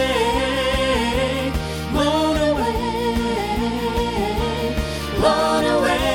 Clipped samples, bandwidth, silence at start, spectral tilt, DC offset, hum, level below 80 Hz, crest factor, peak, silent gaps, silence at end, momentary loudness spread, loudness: under 0.1%; 17 kHz; 0 s; -5 dB/octave; under 0.1%; none; -30 dBFS; 16 dB; -4 dBFS; none; 0 s; 5 LU; -20 LUFS